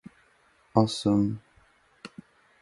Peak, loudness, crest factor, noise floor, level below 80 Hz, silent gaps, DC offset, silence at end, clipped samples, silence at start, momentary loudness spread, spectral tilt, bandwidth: -4 dBFS; -26 LUFS; 24 dB; -63 dBFS; -58 dBFS; none; under 0.1%; 0.55 s; under 0.1%; 0.75 s; 22 LU; -7 dB/octave; 11.5 kHz